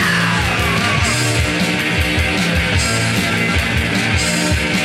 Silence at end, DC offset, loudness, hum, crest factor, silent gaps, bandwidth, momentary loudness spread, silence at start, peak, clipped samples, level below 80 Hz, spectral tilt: 0 s; under 0.1%; -15 LUFS; none; 12 dB; none; 16 kHz; 1 LU; 0 s; -4 dBFS; under 0.1%; -28 dBFS; -4 dB/octave